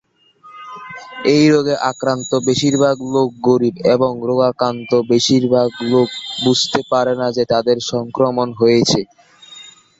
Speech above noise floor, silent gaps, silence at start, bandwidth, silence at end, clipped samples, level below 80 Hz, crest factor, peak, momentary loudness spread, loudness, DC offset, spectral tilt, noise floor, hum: 31 dB; none; 0.45 s; 8 kHz; 0.3 s; under 0.1%; -54 dBFS; 14 dB; -2 dBFS; 8 LU; -16 LUFS; under 0.1%; -5 dB/octave; -46 dBFS; none